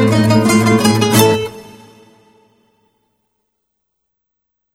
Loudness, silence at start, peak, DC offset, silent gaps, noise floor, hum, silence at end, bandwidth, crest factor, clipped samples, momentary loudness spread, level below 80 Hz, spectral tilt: -12 LUFS; 0 s; 0 dBFS; under 0.1%; none; -73 dBFS; none; 3.1 s; 17 kHz; 16 dB; under 0.1%; 12 LU; -50 dBFS; -5 dB/octave